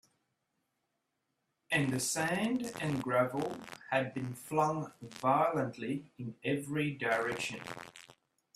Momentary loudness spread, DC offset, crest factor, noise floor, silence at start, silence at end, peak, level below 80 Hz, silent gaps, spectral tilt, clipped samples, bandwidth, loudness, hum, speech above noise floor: 12 LU; under 0.1%; 20 dB; -83 dBFS; 1.7 s; 0.45 s; -16 dBFS; -72 dBFS; none; -4.5 dB/octave; under 0.1%; 15.5 kHz; -34 LUFS; none; 49 dB